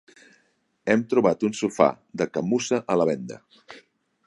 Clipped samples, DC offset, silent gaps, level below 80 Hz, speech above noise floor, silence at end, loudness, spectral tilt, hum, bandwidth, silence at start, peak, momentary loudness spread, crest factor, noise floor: under 0.1%; under 0.1%; none; -64 dBFS; 44 dB; 0.5 s; -24 LUFS; -5.5 dB/octave; none; 11.5 kHz; 0.85 s; -4 dBFS; 11 LU; 22 dB; -67 dBFS